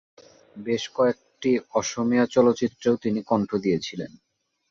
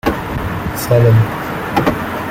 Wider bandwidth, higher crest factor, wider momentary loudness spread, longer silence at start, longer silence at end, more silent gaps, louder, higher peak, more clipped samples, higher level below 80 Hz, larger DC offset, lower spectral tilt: second, 7.6 kHz vs 16.5 kHz; about the same, 18 dB vs 14 dB; about the same, 10 LU vs 10 LU; first, 0.55 s vs 0.05 s; first, 0.65 s vs 0 s; neither; second, -24 LUFS vs -15 LUFS; second, -6 dBFS vs -2 dBFS; neither; second, -62 dBFS vs -34 dBFS; neither; about the same, -5.5 dB/octave vs -6.5 dB/octave